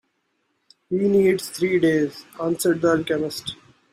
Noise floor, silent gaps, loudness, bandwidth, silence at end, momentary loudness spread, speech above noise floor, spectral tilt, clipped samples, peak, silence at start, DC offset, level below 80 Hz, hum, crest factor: -71 dBFS; none; -22 LUFS; 16 kHz; 0.4 s; 11 LU; 50 dB; -5.5 dB/octave; under 0.1%; -8 dBFS; 0.9 s; under 0.1%; -60 dBFS; none; 16 dB